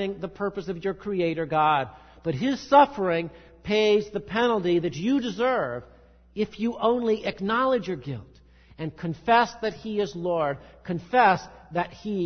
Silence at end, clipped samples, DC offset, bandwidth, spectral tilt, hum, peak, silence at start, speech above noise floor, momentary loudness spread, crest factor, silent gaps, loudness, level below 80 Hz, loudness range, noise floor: 0 s; under 0.1%; under 0.1%; 6.6 kHz; -6 dB/octave; none; -4 dBFS; 0 s; 29 dB; 13 LU; 20 dB; none; -25 LUFS; -56 dBFS; 4 LU; -53 dBFS